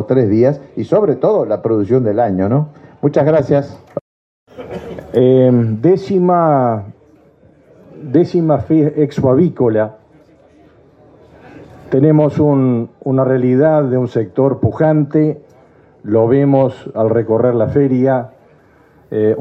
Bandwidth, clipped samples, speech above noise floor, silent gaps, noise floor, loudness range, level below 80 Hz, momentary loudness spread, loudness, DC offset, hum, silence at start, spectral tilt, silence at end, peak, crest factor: 7 kHz; under 0.1%; 35 dB; 4.01-4.46 s; -48 dBFS; 3 LU; -52 dBFS; 12 LU; -14 LUFS; under 0.1%; none; 0 s; -10.5 dB/octave; 0 s; 0 dBFS; 14 dB